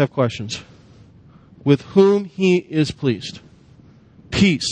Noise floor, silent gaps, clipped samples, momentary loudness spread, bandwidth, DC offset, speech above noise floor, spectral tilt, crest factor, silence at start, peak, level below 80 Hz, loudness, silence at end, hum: -48 dBFS; none; under 0.1%; 14 LU; 9.8 kHz; under 0.1%; 30 dB; -6 dB/octave; 20 dB; 0 s; 0 dBFS; -48 dBFS; -19 LUFS; 0 s; none